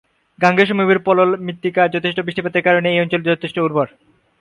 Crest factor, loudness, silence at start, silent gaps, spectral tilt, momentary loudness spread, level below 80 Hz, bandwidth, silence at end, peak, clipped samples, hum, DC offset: 16 dB; -17 LUFS; 0.4 s; none; -7 dB/octave; 7 LU; -60 dBFS; 10.5 kHz; 0.55 s; 0 dBFS; under 0.1%; none; under 0.1%